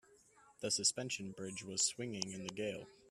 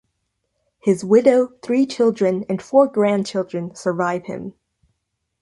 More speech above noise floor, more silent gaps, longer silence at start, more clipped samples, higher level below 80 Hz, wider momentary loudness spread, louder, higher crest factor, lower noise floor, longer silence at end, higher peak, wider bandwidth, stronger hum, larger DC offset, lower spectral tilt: second, 26 dB vs 57 dB; neither; second, 0.1 s vs 0.85 s; neither; second, -78 dBFS vs -64 dBFS; about the same, 12 LU vs 12 LU; second, -38 LUFS vs -19 LUFS; first, 24 dB vs 18 dB; second, -67 dBFS vs -75 dBFS; second, 0 s vs 0.9 s; second, -18 dBFS vs -2 dBFS; first, 14.5 kHz vs 11.5 kHz; neither; neither; second, -2 dB/octave vs -6.5 dB/octave